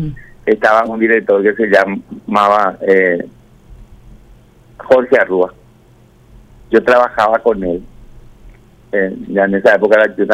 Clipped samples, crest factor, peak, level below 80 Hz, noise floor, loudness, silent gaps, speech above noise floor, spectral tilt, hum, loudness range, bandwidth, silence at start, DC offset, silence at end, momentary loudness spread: under 0.1%; 14 dB; 0 dBFS; -42 dBFS; -46 dBFS; -13 LUFS; none; 33 dB; -6.5 dB/octave; none; 4 LU; 11 kHz; 0 s; under 0.1%; 0 s; 10 LU